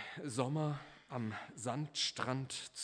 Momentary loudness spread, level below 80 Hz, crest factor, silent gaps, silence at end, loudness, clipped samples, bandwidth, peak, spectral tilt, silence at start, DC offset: 7 LU; -78 dBFS; 20 dB; none; 0 s; -40 LUFS; under 0.1%; 11 kHz; -20 dBFS; -4.5 dB/octave; 0 s; under 0.1%